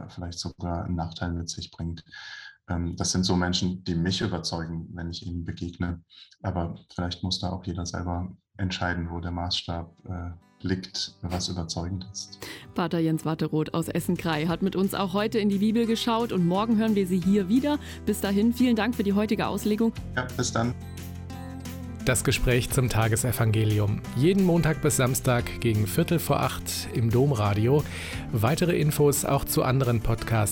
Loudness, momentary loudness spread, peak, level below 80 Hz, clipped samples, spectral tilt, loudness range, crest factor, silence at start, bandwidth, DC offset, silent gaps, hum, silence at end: -26 LUFS; 13 LU; -10 dBFS; -44 dBFS; under 0.1%; -5.5 dB/octave; 8 LU; 16 dB; 0 s; 17.5 kHz; under 0.1%; none; none; 0 s